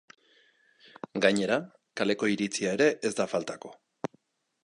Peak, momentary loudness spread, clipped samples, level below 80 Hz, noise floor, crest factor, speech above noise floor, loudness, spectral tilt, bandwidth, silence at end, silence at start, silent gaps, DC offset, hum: -8 dBFS; 16 LU; under 0.1%; -72 dBFS; -68 dBFS; 22 dB; 40 dB; -29 LUFS; -4 dB/octave; 11.5 kHz; 0.9 s; 1.15 s; none; under 0.1%; none